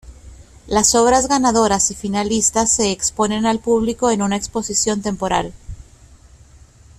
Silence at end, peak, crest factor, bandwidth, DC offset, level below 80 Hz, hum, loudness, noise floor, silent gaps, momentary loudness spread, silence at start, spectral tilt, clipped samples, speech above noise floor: 1.15 s; -2 dBFS; 18 dB; 14 kHz; under 0.1%; -40 dBFS; none; -17 LUFS; -46 dBFS; none; 7 LU; 0.05 s; -3 dB/octave; under 0.1%; 29 dB